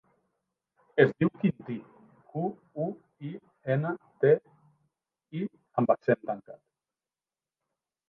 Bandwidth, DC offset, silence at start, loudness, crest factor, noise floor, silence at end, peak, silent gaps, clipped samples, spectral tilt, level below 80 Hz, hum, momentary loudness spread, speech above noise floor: 4.9 kHz; under 0.1%; 0.95 s; -29 LUFS; 24 dB; under -90 dBFS; 1.55 s; -6 dBFS; none; under 0.1%; -10 dB/octave; -72 dBFS; none; 16 LU; over 62 dB